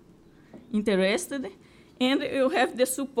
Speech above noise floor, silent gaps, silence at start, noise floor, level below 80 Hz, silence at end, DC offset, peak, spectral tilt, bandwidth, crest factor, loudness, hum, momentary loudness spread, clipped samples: 29 dB; none; 0.55 s; -54 dBFS; -64 dBFS; 0 s; under 0.1%; -10 dBFS; -4 dB/octave; 16.5 kHz; 16 dB; -26 LUFS; none; 10 LU; under 0.1%